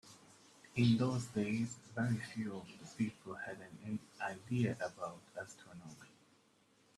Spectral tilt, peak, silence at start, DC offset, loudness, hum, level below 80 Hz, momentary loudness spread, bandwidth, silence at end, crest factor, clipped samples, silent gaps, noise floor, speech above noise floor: -6.5 dB/octave; -20 dBFS; 0.05 s; under 0.1%; -40 LUFS; none; -74 dBFS; 20 LU; 12.5 kHz; 0.9 s; 20 dB; under 0.1%; none; -71 dBFS; 32 dB